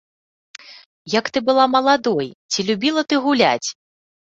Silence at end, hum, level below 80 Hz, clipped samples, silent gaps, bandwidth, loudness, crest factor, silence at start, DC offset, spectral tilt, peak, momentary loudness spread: 0.65 s; none; -64 dBFS; under 0.1%; 0.86-1.05 s, 2.35-2.49 s; 8 kHz; -18 LUFS; 20 dB; 0.7 s; under 0.1%; -3.5 dB/octave; 0 dBFS; 13 LU